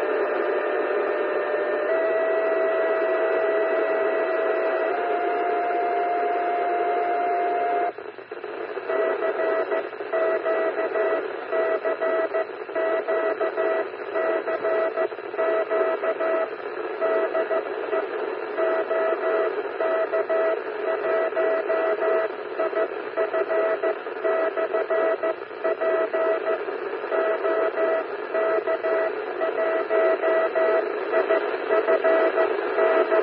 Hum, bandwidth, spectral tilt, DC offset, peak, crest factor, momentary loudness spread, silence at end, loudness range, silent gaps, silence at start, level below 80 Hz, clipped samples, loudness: none; 4.9 kHz; -8 dB/octave; under 0.1%; -8 dBFS; 16 dB; 6 LU; 0 s; 2 LU; none; 0 s; -86 dBFS; under 0.1%; -24 LUFS